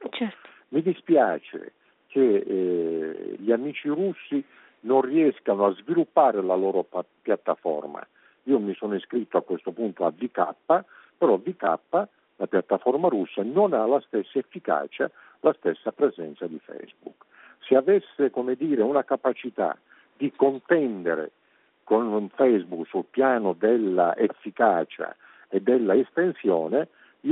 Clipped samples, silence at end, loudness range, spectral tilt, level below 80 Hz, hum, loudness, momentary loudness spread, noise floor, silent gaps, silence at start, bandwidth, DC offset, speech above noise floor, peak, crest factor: under 0.1%; 0 s; 4 LU; -5 dB/octave; -78 dBFS; none; -25 LUFS; 11 LU; -57 dBFS; none; 0 s; 4 kHz; under 0.1%; 33 dB; -6 dBFS; 18 dB